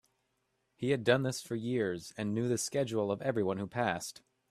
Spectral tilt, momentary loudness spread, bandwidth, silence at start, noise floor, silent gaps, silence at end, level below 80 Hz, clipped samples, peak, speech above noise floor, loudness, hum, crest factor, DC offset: -5 dB/octave; 8 LU; 14.5 kHz; 0.8 s; -79 dBFS; none; 0.4 s; -70 dBFS; under 0.1%; -12 dBFS; 46 dB; -33 LUFS; none; 22 dB; under 0.1%